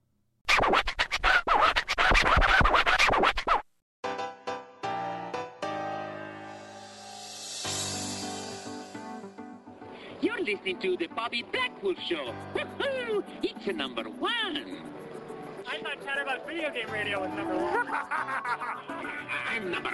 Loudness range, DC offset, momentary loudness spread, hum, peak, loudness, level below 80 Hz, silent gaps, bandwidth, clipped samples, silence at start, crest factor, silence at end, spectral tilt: 13 LU; under 0.1%; 19 LU; none; -10 dBFS; -28 LUFS; -42 dBFS; 3.82-4.03 s; 13.5 kHz; under 0.1%; 0.45 s; 20 dB; 0 s; -3 dB/octave